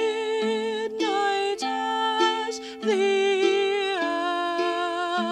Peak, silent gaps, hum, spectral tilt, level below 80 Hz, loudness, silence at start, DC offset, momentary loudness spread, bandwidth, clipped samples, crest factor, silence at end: -10 dBFS; none; none; -3 dB/octave; -70 dBFS; -25 LUFS; 0 s; under 0.1%; 5 LU; 11 kHz; under 0.1%; 14 dB; 0 s